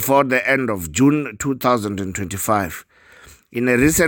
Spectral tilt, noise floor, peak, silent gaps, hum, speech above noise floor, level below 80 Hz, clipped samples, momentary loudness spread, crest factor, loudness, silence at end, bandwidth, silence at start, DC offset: -5 dB/octave; -47 dBFS; -4 dBFS; none; none; 29 dB; -44 dBFS; under 0.1%; 10 LU; 16 dB; -19 LUFS; 0 s; 17 kHz; 0 s; under 0.1%